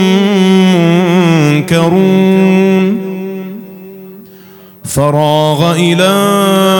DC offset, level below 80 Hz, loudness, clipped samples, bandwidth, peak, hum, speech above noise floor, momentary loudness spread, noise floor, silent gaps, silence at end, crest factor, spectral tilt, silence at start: under 0.1%; -48 dBFS; -9 LUFS; 0.2%; 17.5 kHz; 0 dBFS; none; 28 dB; 16 LU; -36 dBFS; none; 0 s; 10 dB; -6 dB/octave; 0 s